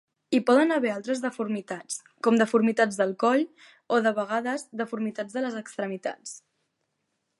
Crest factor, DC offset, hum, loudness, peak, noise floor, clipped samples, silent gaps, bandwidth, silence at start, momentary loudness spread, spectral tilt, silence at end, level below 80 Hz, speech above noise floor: 18 dB; under 0.1%; none; -26 LUFS; -8 dBFS; -78 dBFS; under 0.1%; none; 11.5 kHz; 0.3 s; 13 LU; -4.5 dB/octave; 1 s; -80 dBFS; 52 dB